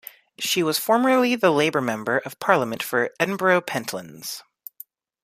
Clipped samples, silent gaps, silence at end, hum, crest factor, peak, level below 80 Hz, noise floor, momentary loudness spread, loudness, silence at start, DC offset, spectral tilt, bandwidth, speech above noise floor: under 0.1%; none; 0.8 s; none; 22 dB; -2 dBFS; -70 dBFS; -48 dBFS; 15 LU; -22 LUFS; 0.4 s; under 0.1%; -4 dB/octave; 15.5 kHz; 26 dB